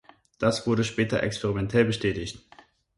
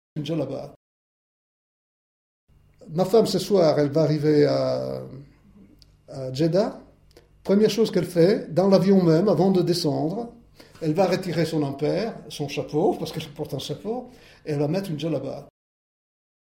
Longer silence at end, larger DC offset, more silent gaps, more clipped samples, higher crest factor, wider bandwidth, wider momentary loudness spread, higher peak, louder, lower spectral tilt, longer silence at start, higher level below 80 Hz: second, 0.6 s vs 1 s; neither; second, none vs 0.76-2.47 s; neither; about the same, 20 dB vs 20 dB; second, 11.5 kHz vs 16.5 kHz; second, 9 LU vs 14 LU; second, -8 dBFS vs -4 dBFS; second, -26 LUFS vs -23 LUFS; second, -5.5 dB/octave vs -7 dB/octave; first, 0.4 s vs 0.15 s; first, -50 dBFS vs -58 dBFS